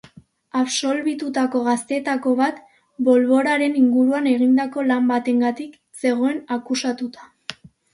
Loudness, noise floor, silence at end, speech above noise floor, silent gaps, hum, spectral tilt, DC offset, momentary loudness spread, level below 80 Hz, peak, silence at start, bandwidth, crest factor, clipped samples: -20 LUFS; -49 dBFS; 0.4 s; 30 dB; none; none; -3.5 dB/octave; under 0.1%; 15 LU; -70 dBFS; -4 dBFS; 0.55 s; 11.5 kHz; 16 dB; under 0.1%